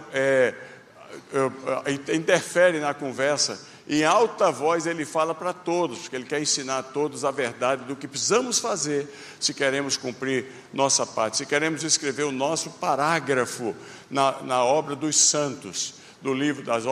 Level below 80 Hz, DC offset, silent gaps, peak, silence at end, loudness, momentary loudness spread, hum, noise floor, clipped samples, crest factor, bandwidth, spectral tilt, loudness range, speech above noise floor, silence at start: -72 dBFS; under 0.1%; none; -4 dBFS; 0 s; -24 LUFS; 9 LU; none; -45 dBFS; under 0.1%; 20 dB; 14 kHz; -2.5 dB/octave; 3 LU; 21 dB; 0 s